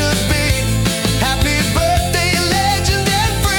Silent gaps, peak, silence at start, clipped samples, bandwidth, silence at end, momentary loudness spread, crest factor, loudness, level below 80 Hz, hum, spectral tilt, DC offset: none; -4 dBFS; 0 s; under 0.1%; 18 kHz; 0 s; 2 LU; 12 dB; -15 LUFS; -24 dBFS; none; -4 dB/octave; under 0.1%